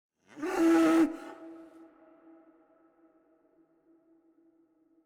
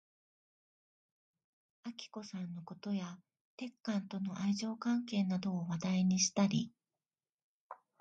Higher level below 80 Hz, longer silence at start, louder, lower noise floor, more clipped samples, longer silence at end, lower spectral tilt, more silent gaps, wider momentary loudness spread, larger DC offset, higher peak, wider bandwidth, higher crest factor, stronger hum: first, -70 dBFS vs -78 dBFS; second, 0.35 s vs 1.85 s; first, -27 LUFS vs -37 LUFS; second, -68 dBFS vs under -90 dBFS; neither; first, 3.45 s vs 0.25 s; about the same, -4.5 dB/octave vs -5 dB/octave; second, none vs 3.41-3.58 s, 7.32-7.70 s; first, 26 LU vs 18 LU; neither; about the same, -16 dBFS vs -18 dBFS; first, 14 kHz vs 8.8 kHz; about the same, 16 dB vs 20 dB; neither